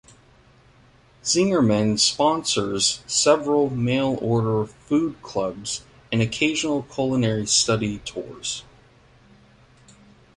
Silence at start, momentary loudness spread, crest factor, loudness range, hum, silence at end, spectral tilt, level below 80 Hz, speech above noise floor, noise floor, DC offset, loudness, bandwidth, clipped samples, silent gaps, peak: 1.25 s; 12 LU; 20 dB; 4 LU; none; 1.75 s; -4 dB/octave; -54 dBFS; 32 dB; -54 dBFS; under 0.1%; -22 LUFS; 11.5 kHz; under 0.1%; none; -4 dBFS